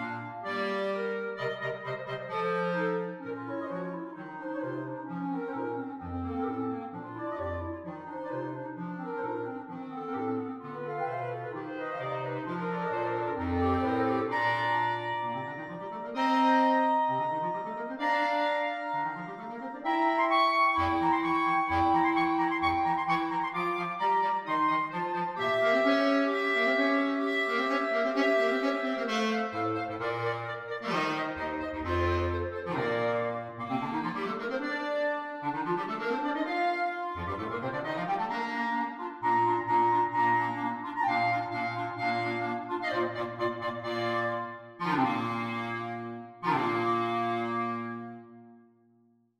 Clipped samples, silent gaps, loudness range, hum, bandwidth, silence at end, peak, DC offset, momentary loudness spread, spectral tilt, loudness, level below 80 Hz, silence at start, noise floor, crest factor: under 0.1%; none; 9 LU; none; 14 kHz; 0.8 s; -14 dBFS; under 0.1%; 12 LU; -6.5 dB/octave; -30 LUFS; -58 dBFS; 0 s; -66 dBFS; 16 dB